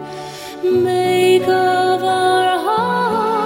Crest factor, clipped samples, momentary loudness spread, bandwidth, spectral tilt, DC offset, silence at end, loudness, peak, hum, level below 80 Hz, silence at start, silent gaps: 12 dB; under 0.1%; 9 LU; 16.5 kHz; -5 dB/octave; under 0.1%; 0 s; -15 LUFS; -4 dBFS; none; -58 dBFS; 0 s; none